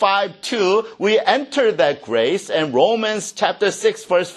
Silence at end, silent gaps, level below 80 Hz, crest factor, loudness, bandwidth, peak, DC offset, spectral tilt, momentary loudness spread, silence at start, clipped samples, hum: 0 s; none; -68 dBFS; 18 dB; -18 LUFS; 12.5 kHz; 0 dBFS; under 0.1%; -3.5 dB/octave; 4 LU; 0 s; under 0.1%; none